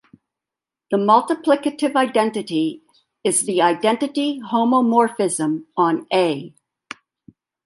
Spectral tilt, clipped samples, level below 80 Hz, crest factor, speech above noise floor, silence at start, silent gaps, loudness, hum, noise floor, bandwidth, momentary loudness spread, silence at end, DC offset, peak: -4 dB/octave; under 0.1%; -72 dBFS; 18 dB; 69 dB; 0.9 s; none; -19 LUFS; none; -88 dBFS; 11.5 kHz; 10 LU; 1.15 s; under 0.1%; -2 dBFS